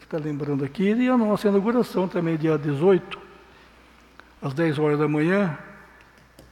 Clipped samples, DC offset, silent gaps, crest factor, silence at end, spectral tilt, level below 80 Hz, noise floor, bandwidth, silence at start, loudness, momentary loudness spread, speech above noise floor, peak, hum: under 0.1%; under 0.1%; none; 16 dB; 0.75 s; -8 dB/octave; -60 dBFS; -52 dBFS; 15 kHz; 0.1 s; -23 LUFS; 10 LU; 30 dB; -8 dBFS; none